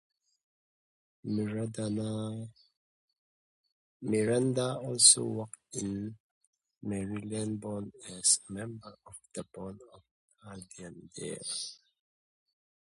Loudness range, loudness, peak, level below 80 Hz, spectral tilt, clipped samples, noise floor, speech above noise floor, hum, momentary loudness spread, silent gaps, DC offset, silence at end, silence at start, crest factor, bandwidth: 15 LU; -30 LUFS; -6 dBFS; -68 dBFS; -3 dB/octave; under 0.1%; under -90 dBFS; over 57 dB; none; 21 LU; 2.77-3.08 s, 3.18-3.64 s, 3.72-4.00 s, 6.20-6.41 s, 6.47-6.53 s, 10.11-10.28 s; under 0.1%; 1.05 s; 1.25 s; 28 dB; 11.5 kHz